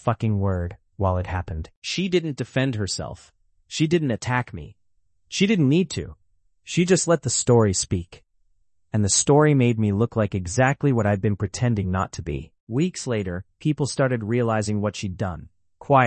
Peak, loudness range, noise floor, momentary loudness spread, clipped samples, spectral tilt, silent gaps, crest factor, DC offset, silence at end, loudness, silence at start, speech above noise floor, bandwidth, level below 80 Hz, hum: -4 dBFS; 5 LU; -71 dBFS; 13 LU; under 0.1%; -5 dB/octave; 1.77-1.82 s, 12.60-12.67 s; 18 dB; under 0.1%; 0 s; -23 LUFS; 0.05 s; 49 dB; 8.8 kHz; -50 dBFS; none